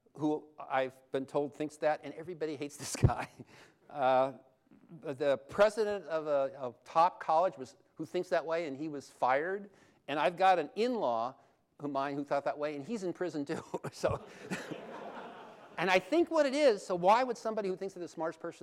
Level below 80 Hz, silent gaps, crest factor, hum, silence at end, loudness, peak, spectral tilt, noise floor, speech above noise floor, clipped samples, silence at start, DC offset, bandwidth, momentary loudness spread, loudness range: -58 dBFS; none; 18 dB; none; 0.05 s; -33 LUFS; -14 dBFS; -5.5 dB/octave; -51 dBFS; 19 dB; under 0.1%; 0.15 s; under 0.1%; 15 kHz; 16 LU; 6 LU